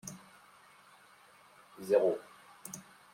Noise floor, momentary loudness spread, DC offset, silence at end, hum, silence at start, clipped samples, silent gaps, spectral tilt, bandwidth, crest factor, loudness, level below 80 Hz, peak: -61 dBFS; 25 LU; under 0.1%; 0.35 s; none; 0.05 s; under 0.1%; none; -4.5 dB/octave; 16.5 kHz; 24 dB; -33 LUFS; -82 dBFS; -14 dBFS